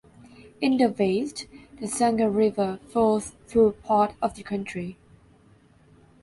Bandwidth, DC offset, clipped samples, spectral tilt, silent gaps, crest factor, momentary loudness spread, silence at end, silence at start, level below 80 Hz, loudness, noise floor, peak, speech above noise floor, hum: 11.5 kHz; under 0.1%; under 0.1%; -5.5 dB/octave; none; 16 dB; 13 LU; 1.3 s; 0.45 s; -56 dBFS; -25 LUFS; -57 dBFS; -10 dBFS; 33 dB; none